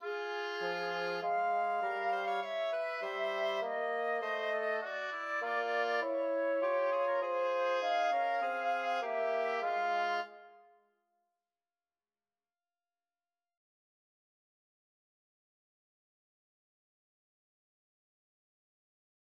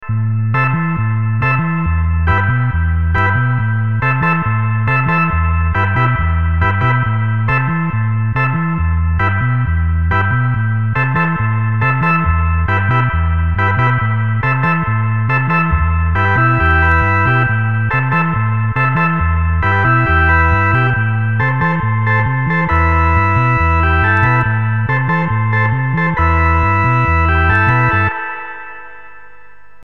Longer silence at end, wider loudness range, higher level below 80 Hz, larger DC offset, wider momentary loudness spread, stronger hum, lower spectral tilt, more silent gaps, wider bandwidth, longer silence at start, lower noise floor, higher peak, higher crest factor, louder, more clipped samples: first, 8.7 s vs 0.65 s; first, 5 LU vs 2 LU; second, under -90 dBFS vs -24 dBFS; second, under 0.1% vs 2%; about the same, 5 LU vs 4 LU; neither; second, -3.5 dB/octave vs -9 dB/octave; neither; first, 11 kHz vs 5 kHz; about the same, 0 s vs 0 s; first, under -90 dBFS vs -45 dBFS; second, -22 dBFS vs -2 dBFS; about the same, 14 dB vs 12 dB; second, -34 LUFS vs -14 LUFS; neither